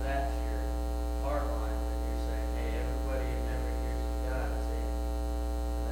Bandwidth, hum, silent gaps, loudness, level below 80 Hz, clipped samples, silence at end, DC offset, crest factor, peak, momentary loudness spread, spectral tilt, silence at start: 16.5 kHz; 60 Hz at -30 dBFS; none; -34 LUFS; -32 dBFS; under 0.1%; 0 s; under 0.1%; 12 dB; -20 dBFS; 2 LU; -6.5 dB/octave; 0 s